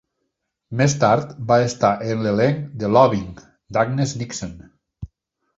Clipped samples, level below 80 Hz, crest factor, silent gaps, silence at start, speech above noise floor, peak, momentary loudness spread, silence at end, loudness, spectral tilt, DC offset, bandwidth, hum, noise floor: under 0.1%; -50 dBFS; 20 dB; none; 0.7 s; 57 dB; -2 dBFS; 20 LU; 0.5 s; -19 LUFS; -6 dB/octave; under 0.1%; 8 kHz; none; -76 dBFS